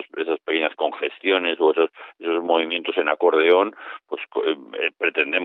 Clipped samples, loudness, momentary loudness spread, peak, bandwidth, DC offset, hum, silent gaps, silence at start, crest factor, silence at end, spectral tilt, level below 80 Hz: under 0.1%; -21 LUFS; 9 LU; -4 dBFS; 4.1 kHz; under 0.1%; none; none; 0 s; 18 dB; 0 s; -6 dB/octave; -86 dBFS